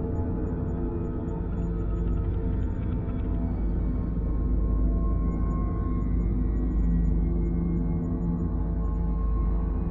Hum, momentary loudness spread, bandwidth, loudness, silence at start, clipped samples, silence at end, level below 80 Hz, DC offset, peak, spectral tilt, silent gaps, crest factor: none; 3 LU; 2.5 kHz; -29 LUFS; 0 s; under 0.1%; 0 s; -28 dBFS; under 0.1%; -14 dBFS; -12 dB/octave; none; 12 dB